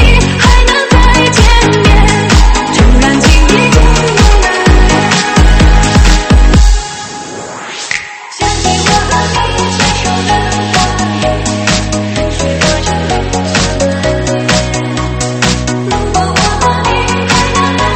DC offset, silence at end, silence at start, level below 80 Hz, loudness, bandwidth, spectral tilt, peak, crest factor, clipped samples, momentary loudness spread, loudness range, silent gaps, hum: under 0.1%; 0 s; 0 s; -12 dBFS; -9 LUFS; 8.8 kHz; -4.5 dB/octave; 0 dBFS; 8 dB; 2%; 7 LU; 5 LU; none; none